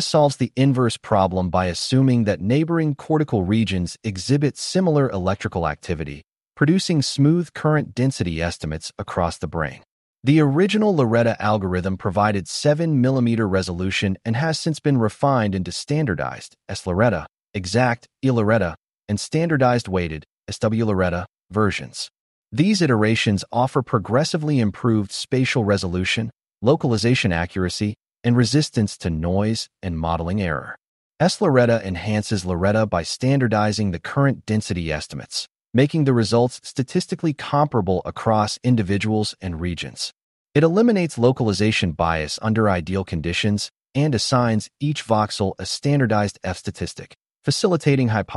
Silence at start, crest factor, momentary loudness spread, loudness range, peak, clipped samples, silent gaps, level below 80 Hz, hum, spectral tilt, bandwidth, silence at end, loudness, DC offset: 0 s; 16 dB; 10 LU; 2 LU; -4 dBFS; under 0.1%; 9.91-10.15 s, 20.32-20.38 s, 22.20-22.43 s, 30.87-31.11 s, 40.23-40.46 s; -46 dBFS; none; -6 dB/octave; 11.5 kHz; 0 s; -21 LUFS; under 0.1%